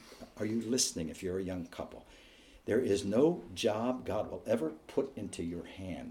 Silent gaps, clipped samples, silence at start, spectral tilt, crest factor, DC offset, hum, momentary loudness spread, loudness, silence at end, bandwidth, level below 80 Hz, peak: none; under 0.1%; 0 s; -4.5 dB/octave; 20 dB; under 0.1%; none; 14 LU; -34 LUFS; 0 s; 17 kHz; -62 dBFS; -16 dBFS